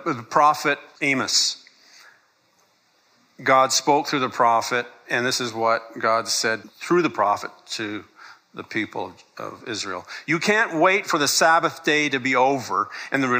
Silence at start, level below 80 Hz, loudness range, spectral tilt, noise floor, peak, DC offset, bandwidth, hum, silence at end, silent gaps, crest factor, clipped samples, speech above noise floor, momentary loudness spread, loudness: 0 s; -74 dBFS; 6 LU; -2.5 dB/octave; -63 dBFS; -4 dBFS; under 0.1%; 15.5 kHz; none; 0 s; none; 18 dB; under 0.1%; 41 dB; 13 LU; -21 LUFS